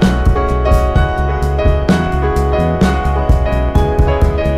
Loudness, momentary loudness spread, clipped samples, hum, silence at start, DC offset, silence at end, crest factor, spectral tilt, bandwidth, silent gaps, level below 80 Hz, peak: -14 LUFS; 2 LU; under 0.1%; none; 0 s; under 0.1%; 0 s; 12 dB; -7.5 dB/octave; 13 kHz; none; -16 dBFS; 0 dBFS